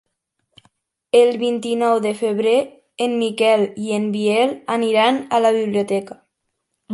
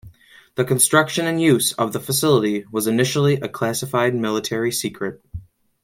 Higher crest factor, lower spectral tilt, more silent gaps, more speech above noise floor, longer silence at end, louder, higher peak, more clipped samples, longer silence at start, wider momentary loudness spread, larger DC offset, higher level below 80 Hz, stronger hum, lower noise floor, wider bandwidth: about the same, 16 dB vs 18 dB; about the same, -5 dB/octave vs -4 dB/octave; neither; first, 57 dB vs 29 dB; second, 0 s vs 0.4 s; about the same, -18 LUFS vs -19 LUFS; about the same, -2 dBFS vs -2 dBFS; neither; first, 1.15 s vs 0.05 s; second, 7 LU vs 13 LU; neither; second, -70 dBFS vs -54 dBFS; neither; first, -75 dBFS vs -48 dBFS; second, 11.5 kHz vs 16.5 kHz